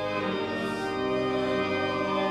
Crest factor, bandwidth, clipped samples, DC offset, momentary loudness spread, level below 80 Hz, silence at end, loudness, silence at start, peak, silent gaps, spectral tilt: 12 dB; 12 kHz; under 0.1%; under 0.1%; 3 LU; -56 dBFS; 0 s; -28 LUFS; 0 s; -16 dBFS; none; -5.5 dB/octave